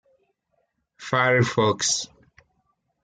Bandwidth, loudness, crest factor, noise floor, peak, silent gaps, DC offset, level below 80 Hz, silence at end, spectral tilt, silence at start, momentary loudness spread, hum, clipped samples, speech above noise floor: 9.6 kHz; -21 LUFS; 20 dB; -73 dBFS; -6 dBFS; none; under 0.1%; -64 dBFS; 0.95 s; -3.5 dB/octave; 1 s; 15 LU; none; under 0.1%; 51 dB